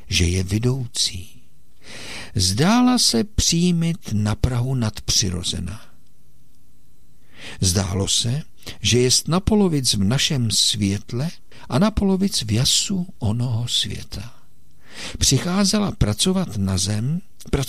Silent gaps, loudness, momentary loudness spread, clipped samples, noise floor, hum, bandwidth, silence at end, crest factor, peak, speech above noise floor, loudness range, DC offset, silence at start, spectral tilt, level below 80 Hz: none; -20 LUFS; 13 LU; under 0.1%; -57 dBFS; none; 16 kHz; 0 s; 16 dB; -6 dBFS; 36 dB; 6 LU; 2%; 0.1 s; -4 dB/octave; -36 dBFS